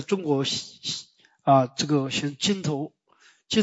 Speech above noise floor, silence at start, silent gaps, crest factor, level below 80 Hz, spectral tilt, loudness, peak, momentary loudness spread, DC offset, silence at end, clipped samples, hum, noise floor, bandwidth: 35 dB; 0 s; none; 20 dB; -66 dBFS; -4.5 dB/octave; -25 LUFS; -6 dBFS; 11 LU; under 0.1%; 0 s; under 0.1%; none; -60 dBFS; 8.2 kHz